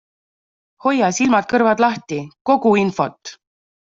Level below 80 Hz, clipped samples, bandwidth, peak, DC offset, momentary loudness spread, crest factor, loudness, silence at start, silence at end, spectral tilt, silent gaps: -60 dBFS; under 0.1%; 7.8 kHz; -2 dBFS; under 0.1%; 12 LU; 16 dB; -17 LUFS; 0.85 s; 0.6 s; -5 dB/octave; 2.41-2.45 s